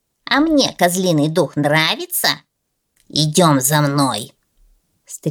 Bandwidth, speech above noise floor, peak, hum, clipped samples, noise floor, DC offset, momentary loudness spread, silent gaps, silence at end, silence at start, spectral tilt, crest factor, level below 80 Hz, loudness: 19 kHz; 55 dB; -2 dBFS; none; under 0.1%; -71 dBFS; under 0.1%; 13 LU; none; 0 s; 0.3 s; -4 dB/octave; 16 dB; -54 dBFS; -16 LUFS